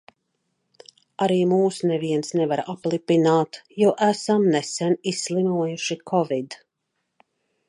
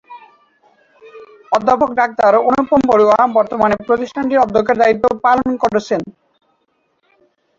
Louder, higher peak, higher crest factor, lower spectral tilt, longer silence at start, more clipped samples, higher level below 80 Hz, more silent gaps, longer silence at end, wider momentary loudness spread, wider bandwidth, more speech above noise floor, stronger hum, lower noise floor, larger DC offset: second, -22 LUFS vs -14 LUFS; second, -6 dBFS vs -2 dBFS; about the same, 16 dB vs 14 dB; about the same, -5.5 dB/octave vs -6 dB/octave; first, 1.2 s vs 0.1 s; neither; second, -74 dBFS vs -50 dBFS; neither; second, 1.15 s vs 1.5 s; about the same, 8 LU vs 7 LU; first, 11.5 kHz vs 7.8 kHz; first, 56 dB vs 50 dB; neither; first, -77 dBFS vs -64 dBFS; neither